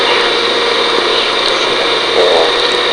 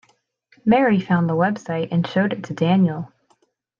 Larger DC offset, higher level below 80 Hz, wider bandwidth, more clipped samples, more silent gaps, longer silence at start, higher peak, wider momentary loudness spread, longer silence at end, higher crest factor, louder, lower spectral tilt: neither; first, -44 dBFS vs -62 dBFS; first, 11 kHz vs 7.2 kHz; neither; neither; second, 0 s vs 0.65 s; first, 0 dBFS vs -6 dBFS; second, 2 LU vs 9 LU; second, 0 s vs 0.75 s; about the same, 12 dB vs 16 dB; first, -10 LUFS vs -20 LUFS; second, -1.5 dB/octave vs -8 dB/octave